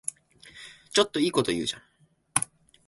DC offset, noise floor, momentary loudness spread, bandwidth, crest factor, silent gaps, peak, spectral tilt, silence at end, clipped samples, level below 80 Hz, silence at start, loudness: under 0.1%; -52 dBFS; 21 LU; 12 kHz; 24 dB; none; -6 dBFS; -3 dB/octave; 0.45 s; under 0.1%; -62 dBFS; 0.45 s; -27 LUFS